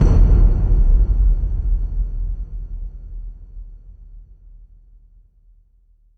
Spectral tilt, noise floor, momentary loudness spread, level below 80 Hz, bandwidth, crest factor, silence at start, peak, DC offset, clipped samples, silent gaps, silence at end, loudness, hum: -10 dB/octave; -54 dBFS; 24 LU; -18 dBFS; 1.8 kHz; 16 dB; 0 s; -2 dBFS; under 0.1%; under 0.1%; none; 1.95 s; -20 LUFS; none